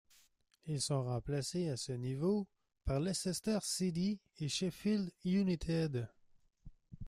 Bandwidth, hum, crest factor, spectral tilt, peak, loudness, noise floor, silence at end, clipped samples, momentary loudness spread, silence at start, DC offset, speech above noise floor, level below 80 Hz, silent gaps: 14.5 kHz; none; 14 dB; -5.5 dB/octave; -24 dBFS; -37 LUFS; -71 dBFS; 0 s; under 0.1%; 7 LU; 0.65 s; under 0.1%; 34 dB; -56 dBFS; none